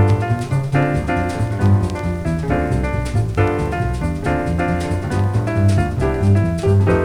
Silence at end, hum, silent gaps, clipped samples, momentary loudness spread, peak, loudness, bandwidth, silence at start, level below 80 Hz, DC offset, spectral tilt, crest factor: 0 s; none; none; under 0.1%; 5 LU; -2 dBFS; -18 LUFS; 11 kHz; 0 s; -28 dBFS; under 0.1%; -8 dB/octave; 14 dB